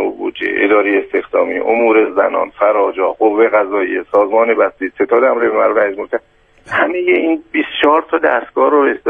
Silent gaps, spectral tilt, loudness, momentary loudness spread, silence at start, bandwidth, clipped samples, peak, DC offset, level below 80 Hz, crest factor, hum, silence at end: none; -6 dB/octave; -14 LUFS; 6 LU; 0 s; 4.6 kHz; under 0.1%; 0 dBFS; under 0.1%; -54 dBFS; 14 dB; none; 0 s